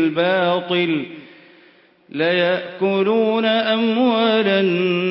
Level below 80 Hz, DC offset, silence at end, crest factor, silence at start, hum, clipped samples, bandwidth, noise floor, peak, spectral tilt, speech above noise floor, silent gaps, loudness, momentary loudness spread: -68 dBFS; under 0.1%; 0 s; 12 dB; 0 s; none; under 0.1%; 5.8 kHz; -52 dBFS; -6 dBFS; -10.5 dB/octave; 34 dB; none; -18 LUFS; 5 LU